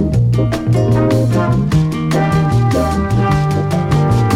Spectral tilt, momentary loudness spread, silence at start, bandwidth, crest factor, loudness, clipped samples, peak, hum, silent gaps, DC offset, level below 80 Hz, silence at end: -7.5 dB/octave; 3 LU; 0 s; 13.5 kHz; 10 dB; -14 LUFS; under 0.1%; -2 dBFS; none; none; under 0.1%; -28 dBFS; 0 s